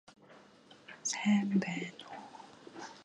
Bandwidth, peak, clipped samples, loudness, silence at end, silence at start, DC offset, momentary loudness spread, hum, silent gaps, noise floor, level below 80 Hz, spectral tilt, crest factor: 11 kHz; -18 dBFS; under 0.1%; -33 LUFS; 0 s; 0.3 s; under 0.1%; 22 LU; none; none; -59 dBFS; -80 dBFS; -4.5 dB/octave; 18 dB